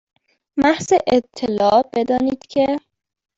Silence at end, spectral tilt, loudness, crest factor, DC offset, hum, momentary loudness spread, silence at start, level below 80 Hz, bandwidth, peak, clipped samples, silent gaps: 0.6 s; -5 dB/octave; -18 LUFS; 16 dB; under 0.1%; none; 7 LU; 0.55 s; -52 dBFS; 8 kHz; -2 dBFS; under 0.1%; none